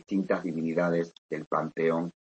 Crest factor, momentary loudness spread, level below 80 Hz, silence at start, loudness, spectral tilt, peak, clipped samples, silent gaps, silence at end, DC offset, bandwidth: 16 dB; 5 LU; -72 dBFS; 0.1 s; -30 LUFS; -8 dB/octave; -14 dBFS; under 0.1%; 1.18-1.29 s, 1.47-1.51 s; 0.25 s; under 0.1%; 8.4 kHz